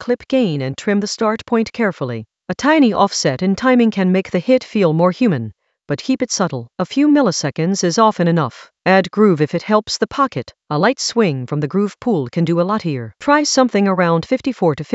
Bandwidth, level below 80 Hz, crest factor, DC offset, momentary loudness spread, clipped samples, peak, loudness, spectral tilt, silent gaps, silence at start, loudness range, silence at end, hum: 8.2 kHz; -56 dBFS; 16 dB; under 0.1%; 8 LU; under 0.1%; 0 dBFS; -16 LUFS; -5.5 dB/octave; none; 0 s; 2 LU; 0 s; none